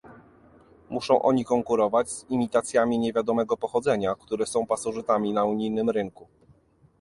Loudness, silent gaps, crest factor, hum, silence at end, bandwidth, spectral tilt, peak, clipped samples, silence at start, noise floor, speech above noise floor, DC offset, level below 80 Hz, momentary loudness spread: -25 LUFS; none; 20 dB; none; 0.8 s; 11.5 kHz; -5.5 dB/octave; -6 dBFS; under 0.1%; 0.05 s; -60 dBFS; 35 dB; under 0.1%; -62 dBFS; 6 LU